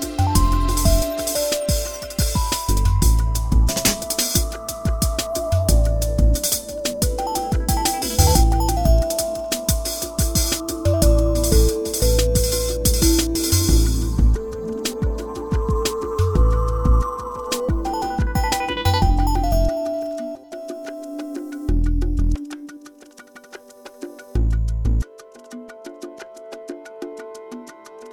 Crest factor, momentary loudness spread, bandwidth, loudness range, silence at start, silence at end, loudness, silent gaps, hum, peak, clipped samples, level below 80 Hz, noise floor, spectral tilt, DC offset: 18 dB; 18 LU; 19.5 kHz; 9 LU; 0 s; 0 s; -20 LUFS; none; none; -2 dBFS; under 0.1%; -22 dBFS; -44 dBFS; -4.5 dB/octave; under 0.1%